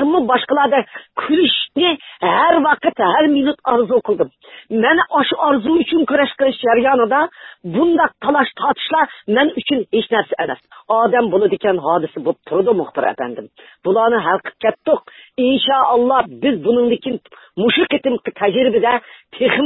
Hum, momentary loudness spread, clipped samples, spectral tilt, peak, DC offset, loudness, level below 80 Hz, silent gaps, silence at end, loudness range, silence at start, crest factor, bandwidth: none; 8 LU; under 0.1%; -10 dB/octave; 0 dBFS; under 0.1%; -16 LUFS; -56 dBFS; none; 0 s; 2 LU; 0 s; 16 dB; 4.1 kHz